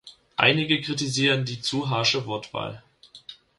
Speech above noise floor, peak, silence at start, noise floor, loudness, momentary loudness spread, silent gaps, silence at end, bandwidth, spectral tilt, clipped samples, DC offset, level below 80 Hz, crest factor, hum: 23 dB; -2 dBFS; 0.05 s; -47 dBFS; -23 LUFS; 17 LU; none; 0.25 s; 11.5 kHz; -4 dB/octave; under 0.1%; under 0.1%; -62 dBFS; 24 dB; none